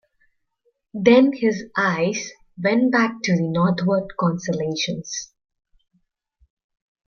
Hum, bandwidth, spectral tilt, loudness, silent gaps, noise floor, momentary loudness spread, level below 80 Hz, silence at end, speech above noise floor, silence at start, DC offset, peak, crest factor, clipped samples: none; 7.2 kHz; -5.5 dB/octave; -20 LUFS; none; -69 dBFS; 14 LU; -60 dBFS; 1.8 s; 49 dB; 0.95 s; under 0.1%; -2 dBFS; 20 dB; under 0.1%